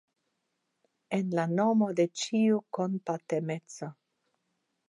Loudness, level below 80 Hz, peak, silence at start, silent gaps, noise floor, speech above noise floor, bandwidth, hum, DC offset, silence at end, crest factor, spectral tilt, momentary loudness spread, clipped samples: -30 LUFS; -84 dBFS; -14 dBFS; 1.1 s; none; -81 dBFS; 52 dB; 11 kHz; none; under 0.1%; 0.95 s; 16 dB; -6 dB/octave; 12 LU; under 0.1%